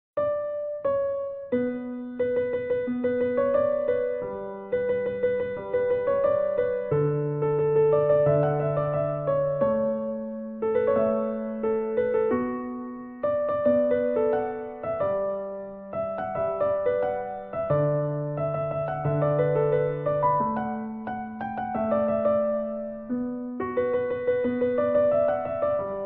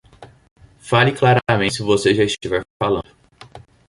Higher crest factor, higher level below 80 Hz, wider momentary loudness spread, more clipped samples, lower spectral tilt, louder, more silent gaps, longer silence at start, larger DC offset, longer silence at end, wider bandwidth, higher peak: about the same, 14 dB vs 18 dB; second, -58 dBFS vs -48 dBFS; about the same, 9 LU vs 8 LU; neither; first, -8 dB/octave vs -5.5 dB/octave; second, -26 LUFS vs -18 LUFS; second, none vs 0.51-0.56 s, 2.70-2.80 s; about the same, 0.15 s vs 0.2 s; neither; second, 0 s vs 0.3 s; second, 3.8 kHz vs 11.5 kHz; second, -12 dBFS vs -2 dBFS